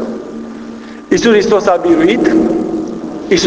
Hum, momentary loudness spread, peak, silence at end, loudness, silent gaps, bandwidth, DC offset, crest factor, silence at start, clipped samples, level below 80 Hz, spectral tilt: none; 17 LU; 0 dBFS; 0 s; -12 LUFS; none; 8 kHz; under 0.1%; 12 dB; 0 s; under 0.1%; -42 dBFS; -4.5 dB/octave